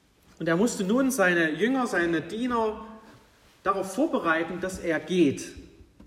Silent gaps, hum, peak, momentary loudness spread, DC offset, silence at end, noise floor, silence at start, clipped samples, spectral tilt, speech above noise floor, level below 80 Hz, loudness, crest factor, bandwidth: none; none; -10 dBFS; 10 LU; under 0.1%; 0 s; -57 dBFS; 0.4 s; under 0.1%; -5 dB/octave; 31 dB; -58 dBFS; -26 LUFS; 16 dB; 16 kHz